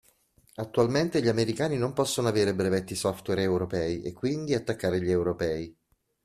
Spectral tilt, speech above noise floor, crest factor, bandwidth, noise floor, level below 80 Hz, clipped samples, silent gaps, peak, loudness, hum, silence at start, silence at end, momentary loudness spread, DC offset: -5.5 dB/octave; 37 dB; 18 dB; 14.5 kHz; -64 dBFS; -58 dBFS; under 0.1%; none; -10 dBFS; -28 LUFS; none; 0.6 s; 0.55 s; 6 LU; under 0.1%